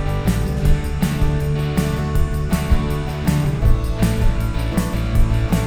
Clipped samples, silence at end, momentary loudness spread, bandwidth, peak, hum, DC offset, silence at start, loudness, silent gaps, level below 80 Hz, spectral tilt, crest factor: under 0.1%; 0 s; 2 LU; 18 kHz; -2 dBFS; none; under 0.1%; 0 s; -20 LUFS; none; -20 dBFS; -6.5 dB/octave; 14 dB